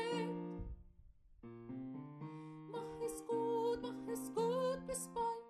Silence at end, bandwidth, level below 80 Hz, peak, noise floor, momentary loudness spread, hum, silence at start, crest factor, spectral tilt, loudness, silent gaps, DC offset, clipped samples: 0 s; 13.5 kHz; -62 dBFS; -26 dBFS; -63 dBFS; 15 LU; none; 0 s; 16 dB; -5 dB/octave; -42 LUFS; none; under 0.1%; under 0.1%